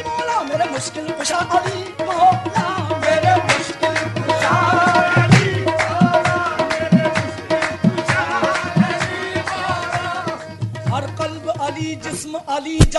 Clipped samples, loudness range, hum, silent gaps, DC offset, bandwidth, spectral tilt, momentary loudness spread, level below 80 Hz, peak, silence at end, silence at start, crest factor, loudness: under 0.1%; 7 LU; none; none; under 0.1%; 12 kHz; -5 dB/octave; 11 LU; -36 dBFS; 0 dBFS; 0 s; 0 s; 18 dB; -18 LUFS